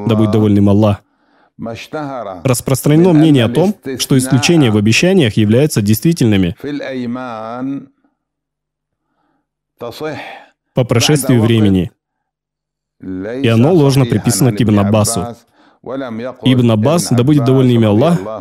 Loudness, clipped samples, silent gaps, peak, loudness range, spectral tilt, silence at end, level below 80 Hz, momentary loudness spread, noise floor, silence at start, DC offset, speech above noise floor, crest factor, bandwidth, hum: -12 LUFS; under 0.1%; none; 0 dBFS; 12 LU; -6 dB/octave; 0 s; -46 dBFS; 14 LU; -80 dBFS; 0 s; under 0.1%; 68 dB; 14 dB; 16 kHz; none